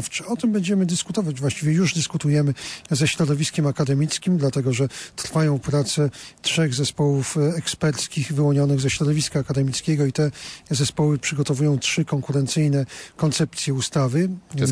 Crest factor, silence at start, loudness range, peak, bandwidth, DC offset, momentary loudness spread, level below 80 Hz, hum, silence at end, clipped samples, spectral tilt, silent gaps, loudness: 12 dB; 0 s; 1 LU; -10 dBFS; 11 kHz; under 0.1%; 5 LU; -54 dBFS; none; 0 s; under 0.1%; -5 dB/octave; none; -22 LUFS